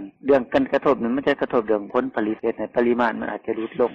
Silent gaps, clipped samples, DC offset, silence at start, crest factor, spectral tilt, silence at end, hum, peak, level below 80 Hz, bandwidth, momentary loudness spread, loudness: none; under 0.1%; under 0.1%; 0 s; 14 dB; -7.5 dB/octave; 0 s; none; -8 dBFS; -56 dBFS; 7.4 kHz; 7 LU; -22 LUFS